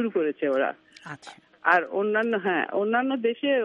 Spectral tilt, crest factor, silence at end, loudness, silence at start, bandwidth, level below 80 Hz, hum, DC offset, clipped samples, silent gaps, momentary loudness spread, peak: -6 dB/octave; 20 dB; 0 s; -25 LUFS; 0 s; 9.4 kHz; -80 dBFS; none; under 0.1%; under 0.1%; none; 19 LU; -6 dBFS